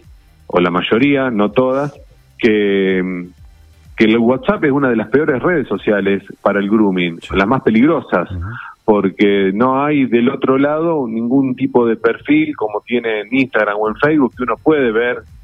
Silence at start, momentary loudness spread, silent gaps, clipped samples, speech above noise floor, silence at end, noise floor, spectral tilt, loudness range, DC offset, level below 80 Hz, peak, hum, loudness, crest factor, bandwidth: 0.55 s; 6 LU; none; under 0.1%; 28 dB; 0.05 s; -42 dBFS; -8 dB/octave; 2 LU; under 0.1%; -44 dBFS; 0 dBFS; none; -15 LUFS; 14 dB; 6.6 kHz